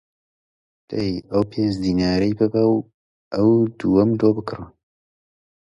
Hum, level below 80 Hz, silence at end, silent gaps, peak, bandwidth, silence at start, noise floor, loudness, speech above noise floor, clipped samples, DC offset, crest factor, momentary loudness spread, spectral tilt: none; -46 dBFS; 1.1 s; 2.94-3.31 s; -4 dBFS; 10.5 kHz; 0.9 s; under -90 dBFS; -20 LUFS; over 71 dB; under 0.1%; under 0.1%; 18 dB; 10 LU; -8 dB/octave